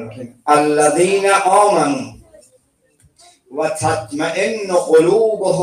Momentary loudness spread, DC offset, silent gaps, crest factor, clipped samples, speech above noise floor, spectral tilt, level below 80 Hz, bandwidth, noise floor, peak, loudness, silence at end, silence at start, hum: 12 LU; under 0.1%; none; 14 dB; under 0.1%; 43 dB; -4.5 dB/octave; -56 dBFS; 15.5 kHz; -57 dBFS; -2 dBFS; -15 LUFS; 0 s; 0 s; none